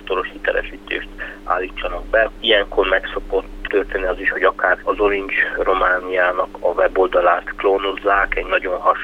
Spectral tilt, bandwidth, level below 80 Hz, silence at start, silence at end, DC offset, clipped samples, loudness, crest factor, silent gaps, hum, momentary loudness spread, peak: -5 dB/octave; 8.4 kHz; -36 dBFS; 0 s; 0 s; under 0.1%; under 0.1%; -18 LUFS; 16 dB; none; none; 8 LU; -2 dBFS